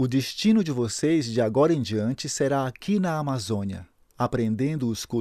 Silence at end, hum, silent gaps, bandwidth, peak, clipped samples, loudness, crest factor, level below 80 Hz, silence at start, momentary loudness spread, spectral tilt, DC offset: 0 s; none; none; 15 kHz; -8 dBFS; under 0.1%; -25 LUFS; 16 dB; -58 dBFS; 0 s; 7 LU; -6 dB/octave; under 0.1%